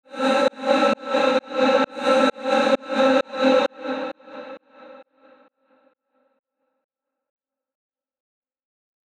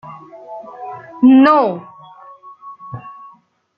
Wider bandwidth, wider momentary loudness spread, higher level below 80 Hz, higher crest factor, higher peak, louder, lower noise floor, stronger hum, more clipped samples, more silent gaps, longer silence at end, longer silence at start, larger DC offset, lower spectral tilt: first, 10.5 kHz vs 5.4 kHz; second, 13 LU vs 27 LU; second, -70 dBFS vs -62 dBFS; about the same, 18 dB vs 16 dB; second, -6 dBFS vs -2 dBFS; second, -20 LUFS vs -11 LUFS; first, -67 dBFS vs -48 dBFS; neither; neither; neither; first, 4.15 s vs 0.7 s; about the same, 0.1 s vs 0.05 s; neither; second, -4 dB/octave vs -8.5 dB/octave